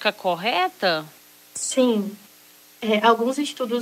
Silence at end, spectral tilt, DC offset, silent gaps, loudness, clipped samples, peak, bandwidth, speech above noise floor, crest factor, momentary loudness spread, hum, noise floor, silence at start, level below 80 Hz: 0 s; -3 dB/octave; under 0.1%; none; -22 LUFS; under 0.1%; -4 dBFS; 16 kHz; 29 dB; 18 dB; 13 LU; 60 Hz at -50 dBFS; -51 dBFS; 0 s; -78 dBFS